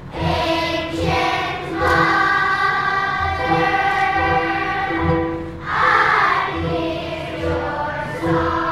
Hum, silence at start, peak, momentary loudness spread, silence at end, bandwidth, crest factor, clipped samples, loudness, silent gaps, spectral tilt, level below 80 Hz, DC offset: none; 0 s; -2 dBFS; 9 LU; 0 s; 14 kHz; 16 dB; under 0.1%; -18 LUFS; none; -5.5 dB/octave; -38 dBFS; under 0.1%